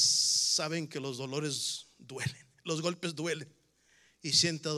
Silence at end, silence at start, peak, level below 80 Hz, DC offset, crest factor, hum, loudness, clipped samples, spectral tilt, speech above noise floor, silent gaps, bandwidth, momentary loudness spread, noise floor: 0 s; 0 s; -12 dBFS; -78 dBFS; under 0.1%; 20 dB; none; -31 LUFS; under 0.1%; -2 dB/octave; 33 dB; none; 15 kHz; 15 LU; -67 dBFS